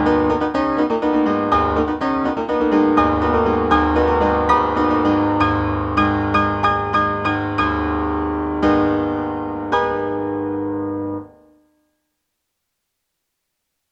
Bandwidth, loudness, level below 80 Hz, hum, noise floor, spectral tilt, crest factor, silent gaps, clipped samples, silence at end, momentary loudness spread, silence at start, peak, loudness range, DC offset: 7.4 kHz; -18 LUFS; -36 dBFS; none; -75 dBFS; -7.5 dB/octave; 18 dB; none; under 0.1%; 2.65 s; 7 LU; 0 s; -2 dBFS; 9 LU; under 0.1%